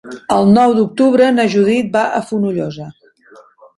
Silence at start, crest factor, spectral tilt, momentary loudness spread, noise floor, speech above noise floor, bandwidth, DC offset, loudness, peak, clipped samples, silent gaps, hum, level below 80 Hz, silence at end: 0.05 s; 14 dB; -6.5 dB/octave; 12 LU; -45 dBFS; 32 dB; 11.5 kHz; under 0.1%; -13 LUFS; 0 dBFS; under 0.1%; none; none; -56 dBFS; 0.85 s